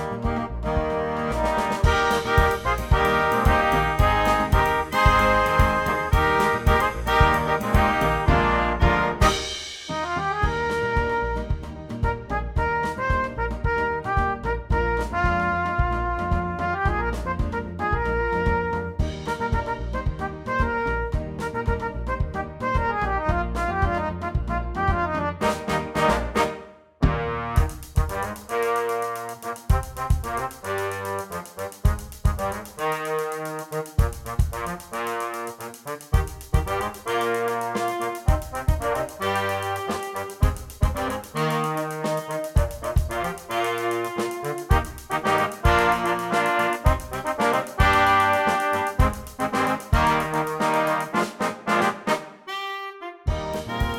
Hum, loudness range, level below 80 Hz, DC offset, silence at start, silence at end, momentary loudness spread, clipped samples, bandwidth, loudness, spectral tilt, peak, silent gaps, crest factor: none; 7 LU; -30 dBFS; under 0.1%; 0 s; 0 s; 9 LU; under 0.1%; 17.5 kHz; -24 LUFS; -5.5 dB/octave; -2 dBFS; none; 20 dB